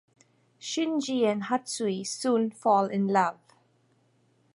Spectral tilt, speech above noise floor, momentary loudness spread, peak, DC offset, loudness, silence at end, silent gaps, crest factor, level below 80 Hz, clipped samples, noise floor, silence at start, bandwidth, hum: -4.5 dB/octave; 40 dB; 6 LU; -10 dBFS; under 0.1%; -27 LUFS; 1.2 s; none; 20 dB; -78 dBFS; under 0.1%; -67 dBFS; 0.6 s; 11.5 kHz; none